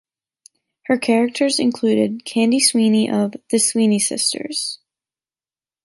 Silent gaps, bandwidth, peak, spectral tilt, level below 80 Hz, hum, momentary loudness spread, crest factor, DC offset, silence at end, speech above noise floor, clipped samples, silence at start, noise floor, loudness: none; 12 kHz; -2 dBFS; -3.5 dB/octave; -68 dBFS; none; 9 LU; 18 dB; under 0.1%; 1.1 s; over 72 dB; under 0.1%; 0.9 s; under -90 dBFS; -18 LUFS